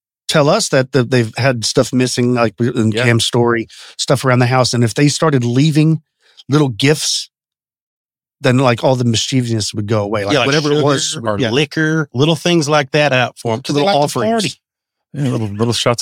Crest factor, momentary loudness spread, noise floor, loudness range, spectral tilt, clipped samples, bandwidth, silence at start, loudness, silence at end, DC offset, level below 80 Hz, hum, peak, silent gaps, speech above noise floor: 14 dB; 6 LU; under -90 dBFS; 3 LU; -5 dB/octave; under 0.1%; 16 kHz; 0.3 s; -14 LUFS; 0 s; under 0.1%; -54 dBFS; none; 0 dBFS; 7.81-8.09 s; over 76 dB